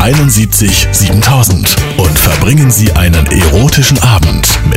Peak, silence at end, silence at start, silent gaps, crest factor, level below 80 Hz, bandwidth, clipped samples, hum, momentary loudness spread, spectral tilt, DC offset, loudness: 0 dBFS; 0 s; 0 s; none; 6 dB; -16 dBFS; 16.5 kHz; 0.4%; none; 2 LU; -4 dB/octave; under 0.1%; -7 LUFS